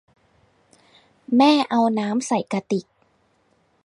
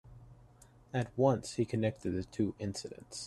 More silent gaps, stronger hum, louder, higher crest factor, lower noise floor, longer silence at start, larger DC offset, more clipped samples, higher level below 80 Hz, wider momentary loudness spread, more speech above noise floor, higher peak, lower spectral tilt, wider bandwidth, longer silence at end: neither; neither; first, -20 LUFS vs -35 LUFS; about the same, 18 dB vs 20 dB; first, -64 dBFS vs -60 dBFS; first, 1.3 s vs 0.05 s; neither; neither; second, -72 dBFS vs -62 dBFS; about the same, 10 LU vs 10 LU; first, 44 dB vs 26 dB; first, -6 dBFS vs -16 dBFS; about the same, -5 dB/octave vs -6 dB/octave; second, 11 kHz vs 12.5 kHz; first, 1.05 s vs 0 s